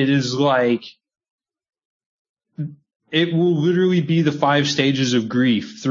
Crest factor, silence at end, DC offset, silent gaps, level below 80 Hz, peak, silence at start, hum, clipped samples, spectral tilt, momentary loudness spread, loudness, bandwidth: 16 dB; 0 s; under 0.1%; 1.30-1.38 s, 1.85-2.00 s, 2.06-2.35 s, 2.96-3.00 s; -66 dBFS; -4 dBFS; 0 s; none; under 0.1%; -6 dB/octave; 9 LU; -18 LUFS; 7.6 kHz